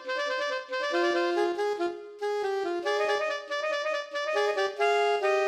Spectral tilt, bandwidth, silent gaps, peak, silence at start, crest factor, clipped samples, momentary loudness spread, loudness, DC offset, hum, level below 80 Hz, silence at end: -1.5 dB/octave; 12.5 kHz; none; -14 dBFS; 0 s; 14 dB; under 0.1%; 6 LU; -28 LUFS; under 0.1%; none; -78 dBFS; 0 s